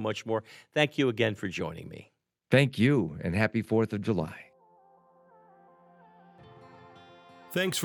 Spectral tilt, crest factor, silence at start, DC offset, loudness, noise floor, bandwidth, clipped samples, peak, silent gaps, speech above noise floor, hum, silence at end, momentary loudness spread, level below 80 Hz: -5.5 dB/octave; 22 dB; 0 s; under 0.1%; -28 LUFS; -61 dBFS; 16 kHz; under 0.1%; -8 dBFS; none; 33 dB; none; 0 s; 14 LU; -66 dBFS